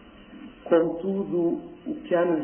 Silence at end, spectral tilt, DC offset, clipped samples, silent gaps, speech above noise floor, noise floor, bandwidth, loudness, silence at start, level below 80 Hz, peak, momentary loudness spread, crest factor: 0 s; -11.5 dB/octave; under 0.1%; under 0.1%; none; 20 dB; -45 dBFS; 3.4 kHz; -26 LUFS; 0.05 s; -60 dBFS; -8 dBFS; 20 LU; 18 dB